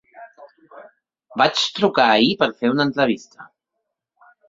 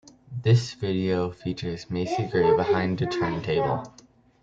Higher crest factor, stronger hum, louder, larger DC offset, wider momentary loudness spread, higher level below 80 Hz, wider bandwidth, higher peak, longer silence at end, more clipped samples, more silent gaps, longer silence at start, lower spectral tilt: about the same, 20 dB vs 16 dB; neither; first, -18 LUFS vs -25 LUFS; neither; second, 6 LU vs 10 LU; second, -64 dBFS vs -54 dBFS; about the same, 7.8 kHz vs 7.8 kHz; first, 0 dBFS vs -8 dBFS; first, 1.05 s vs 0.55 s; neither; neither; second, 0.15 s vs 0.3 s; second, -4.5 dB/octave vs -7 dB/octave